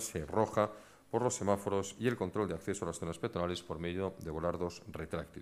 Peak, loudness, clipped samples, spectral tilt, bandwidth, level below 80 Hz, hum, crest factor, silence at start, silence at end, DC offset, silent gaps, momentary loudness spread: -14 dBFS; -36 LUFS; under 0.1%; -5 dB/octave; 15.5 kHz; -58 dBFS; none; 22 dB; 0 s; 0 s; under 0.1%; none; 8 LU